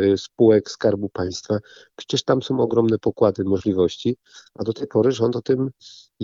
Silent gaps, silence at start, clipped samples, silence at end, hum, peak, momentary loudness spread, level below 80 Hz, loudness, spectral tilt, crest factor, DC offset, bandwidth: none; 0 s; under 0.1%; 0 s; none; -4 dBFS; 10 LU; -58 dBFS; -21 LUFS; -6.5 dB/octave; 18 dB; under 0.1%; 7.6 kHz